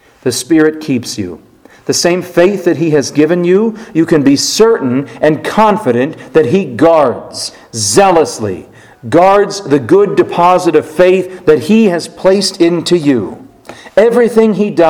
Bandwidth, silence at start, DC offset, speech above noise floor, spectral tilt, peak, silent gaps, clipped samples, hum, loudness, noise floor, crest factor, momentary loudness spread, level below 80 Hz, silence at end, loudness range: 17.5 kHz; 0.25 s; under 0.1%; 24 dB; -5 dB/octave; 0 dBFS; none; 0.7%; none; -10 LUFS; -34 dBFS; 10 dB; 9 LU; -48 dBFS; 0 s; 2 LU